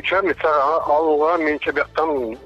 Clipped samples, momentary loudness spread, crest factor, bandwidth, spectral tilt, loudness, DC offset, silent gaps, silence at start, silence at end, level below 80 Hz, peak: under 0.1%; 4 LU; 10 dB; 7.6 kHz; -5.5 dB/octave; -19 LUFS; under 0.1%; none; 0.05 s; 0 s; -50 dBFS; -8 dBFS